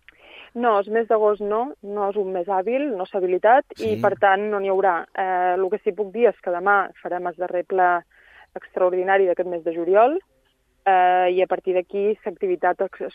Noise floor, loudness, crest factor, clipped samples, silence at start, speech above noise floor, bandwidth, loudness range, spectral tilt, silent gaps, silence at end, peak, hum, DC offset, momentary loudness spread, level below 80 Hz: -64 dBFS; -21 LUFS; 18 dB; under 0.1%; 0.35 s; 44 dB; 6.6 kHz; 2 LU; -7 dB/octave; none; 0.05 s; -4 dBFS; none; under 0.1%; 9 LU; -66 dBFS